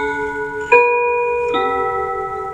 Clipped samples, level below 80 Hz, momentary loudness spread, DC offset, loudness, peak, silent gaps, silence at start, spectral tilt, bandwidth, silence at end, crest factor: under 0.1%; -46 dBFS; 10 LU; under 0.1%; -17 LUFS; 0 dBFS; none; 0 s; -5 dB/octave; 8.8 kHz; 0 s; 18 dB